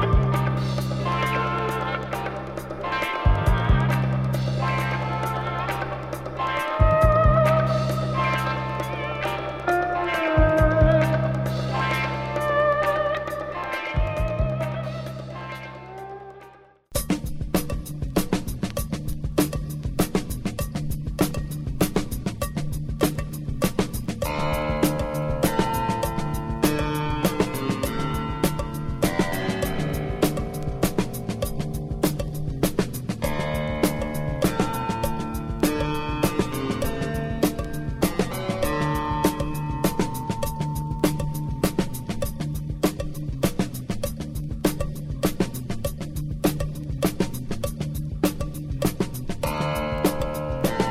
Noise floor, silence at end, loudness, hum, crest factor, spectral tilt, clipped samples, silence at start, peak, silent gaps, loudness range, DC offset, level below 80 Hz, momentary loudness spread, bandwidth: -49 dBFS; 0 s; -25 LUFS; none; 20 dB; -6 dB/octave; under 0.1%; 0 s; -4 dBFS; none; 6 LU; under 0.1%; -32 dBFS; 9 LU; 16 kHz